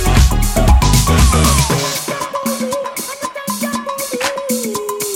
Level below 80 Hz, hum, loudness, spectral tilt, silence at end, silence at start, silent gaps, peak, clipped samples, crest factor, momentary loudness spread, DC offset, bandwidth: -18 dBFS; none; -15 LUFS; -4.5 dB/octave; 0 s; 0 s; none; 0 dBFS; under 0.1%; 14 dB; 10 LU; under 0.1%; 17 kHz